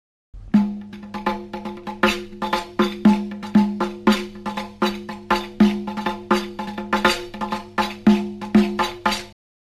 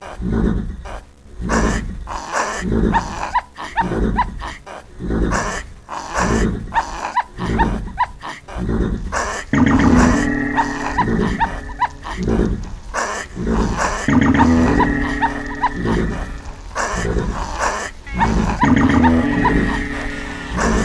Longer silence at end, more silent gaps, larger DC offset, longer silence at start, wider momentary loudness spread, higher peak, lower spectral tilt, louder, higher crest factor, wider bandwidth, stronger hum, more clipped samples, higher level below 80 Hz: first, 0.35 s vs 0 s; neither; second, under 0.1% vs 0.2%; first, 0.35 s vs 0 s; second, 12 LU vs 15 LU; about the same, -2 dBFS vs 0 dBFS; about the same, -5.5 dB/octave vs -5.5 dB/octave; second, -22 LUFS vs -19 LUFS; about the same, 20 dB vs 18 dB; first, 13.5 kHz vs 11 kHz; neither; neither; second, -46 dBFS vs -26 dBFS